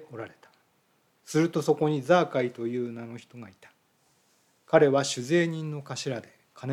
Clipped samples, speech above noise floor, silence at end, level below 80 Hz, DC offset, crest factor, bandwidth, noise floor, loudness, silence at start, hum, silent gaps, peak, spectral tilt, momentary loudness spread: under 0.1%; 42 dB; 0 s; -78 dBFS; under 0.1%; 22 dB; 14.5 kHz; -68 dBFS; -26 LUFS; 0 s; none; none; -6 dBFS; -5.5 dB/octave; 20 LU